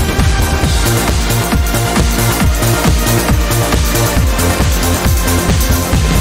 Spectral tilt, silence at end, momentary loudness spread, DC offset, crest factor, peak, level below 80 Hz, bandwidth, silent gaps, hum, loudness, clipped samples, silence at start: -4.5 dB/octave; 0 s; 1 LU; 0.2%; 10 dB; 0 dBFS; -16 dBFS; 16.5 kHz; none; none; -13 LUFS; under 0.1%; 0 s